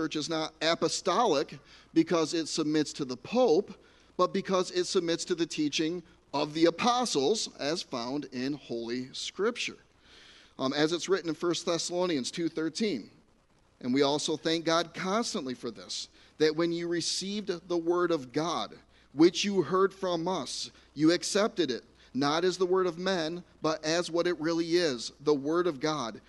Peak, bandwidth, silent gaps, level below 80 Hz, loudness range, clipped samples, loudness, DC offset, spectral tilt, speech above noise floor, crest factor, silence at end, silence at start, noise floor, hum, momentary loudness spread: -10 dBFS; 11.5 kHz; none; -68 dBFS; 3 LU; under 0.1%; -30 LUFS; under 0.1%; -4 dB/octave; 36 dB; 20 dB; 0.1 s; 0 s; -65 dBFS; none; 10 LU